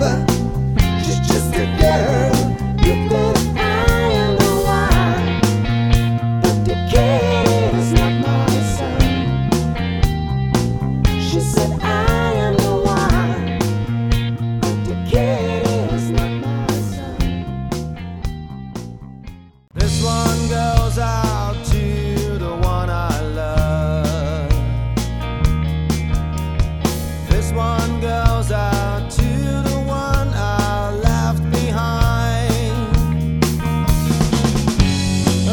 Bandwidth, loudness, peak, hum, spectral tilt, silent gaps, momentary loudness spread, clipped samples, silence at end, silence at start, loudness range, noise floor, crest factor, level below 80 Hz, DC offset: 19.5 kHz; -18 LUFS; 0 dBFS; none; -6 dB/octave; none; 6 LU; under 0.1%; 0 s; 0 s; 4 LU; -37 dBFS; 16 dB; -24 dBFS; under 0.1%